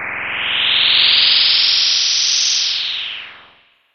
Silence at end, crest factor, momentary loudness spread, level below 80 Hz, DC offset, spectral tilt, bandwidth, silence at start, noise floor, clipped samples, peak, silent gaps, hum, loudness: 0.6 s; 16 dB; 12 LU; -54 dBFS; under 0.1%; 2.5 dB/octave; 6.8 kHz; 0 s; -51 dBFS; under 0.1%; 0 dBFS; none; none; -12 LUFS